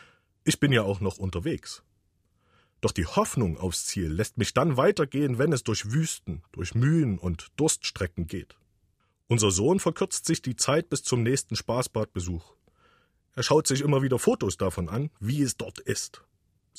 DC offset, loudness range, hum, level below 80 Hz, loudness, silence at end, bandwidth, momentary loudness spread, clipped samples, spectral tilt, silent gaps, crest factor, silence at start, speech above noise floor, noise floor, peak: under 0.1%; 3 LU; none; -50 dBFS; -27 LUFS; 0.6 s; 15.5 kHz; 11 LU; under 0.1%; -5 dB/octave; none; 18 dB; 0.45 s; 44 dB; -70 dBFS; -8 dBFS